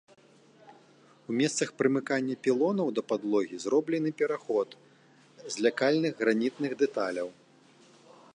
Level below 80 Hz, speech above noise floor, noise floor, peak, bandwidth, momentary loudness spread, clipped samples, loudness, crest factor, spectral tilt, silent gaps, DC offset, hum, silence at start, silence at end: -82 dBFS; 31 dB; -60 dBFS; -10 dBFS; 11 kHz; 8 LU; under 0.1%; -29 LUFS; 20 dB; -5 dB/octave; none; under 0.1%; none; 0.7 s; 1.05 s